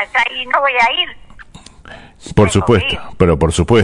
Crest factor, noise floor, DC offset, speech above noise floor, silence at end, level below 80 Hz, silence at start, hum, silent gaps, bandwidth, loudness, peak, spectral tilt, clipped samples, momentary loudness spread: 14 dB; -38 dBFS; under 0.1%; 24 dB; 0 s; -32 dBFS; 0 s; none; none; 11 kHz; -14 LUFS; 0 dBFS; -5 dB/octave; under 0.1%; 7 LU